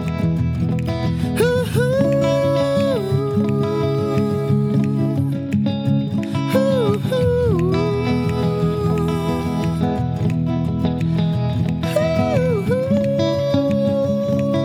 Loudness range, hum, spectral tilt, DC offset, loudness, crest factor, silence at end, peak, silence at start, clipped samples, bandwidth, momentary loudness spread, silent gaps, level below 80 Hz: 2 LU; none; -8 dB/octave; under 0.1%; -19 LUFS; 14 dB; 0 s; -4 dBFS; 0 s; under 0.1%; 16 kHz; 3 LU; none; -38 dBFS